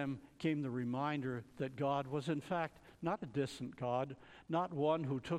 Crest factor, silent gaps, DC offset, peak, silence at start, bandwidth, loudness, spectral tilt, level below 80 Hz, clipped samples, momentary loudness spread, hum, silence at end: 16 dB; none; under 0.1%; -22 dBFS; 0 s; 13.5 kHz; -40 LUFS; -7 dB/octave; -72 dBFS; under 0.1%; 8 LU; none; 0 s